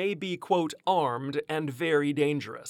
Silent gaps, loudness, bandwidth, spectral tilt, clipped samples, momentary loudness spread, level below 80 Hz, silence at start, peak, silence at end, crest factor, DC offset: none; -28 LUFS; 16.5 kHz; -5.5 dB/octave; under 0.1%; 6 LU; -80 dBFS; 0 s; -12 dBFS; 0 s; 16 dB; under 0.1%